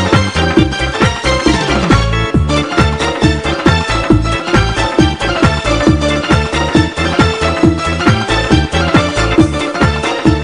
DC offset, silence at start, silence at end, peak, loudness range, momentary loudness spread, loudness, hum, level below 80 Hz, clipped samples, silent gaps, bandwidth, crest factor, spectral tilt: 0.3%; 0 s; 0 s; 0 dBFS; 0 LU; 2 LU; -12 LUFS; none; -22 dBFS; under 0.1%; none; 11 kHz; 12 dB; -5.5 dB/octave